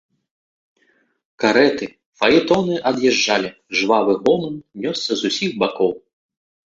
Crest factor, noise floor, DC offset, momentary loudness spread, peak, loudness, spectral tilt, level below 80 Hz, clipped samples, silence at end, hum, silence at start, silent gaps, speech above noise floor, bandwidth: 18 dB; -62 dBFS; under 0.1%; 10 LU; -2 dBFS; -18 LUFS; -4 dB/octave; -58 dBFS; under 0.1%; 0.7 s; none; 1.4 s; 2.06-2.13 s; 44 dB; 7.8 kHz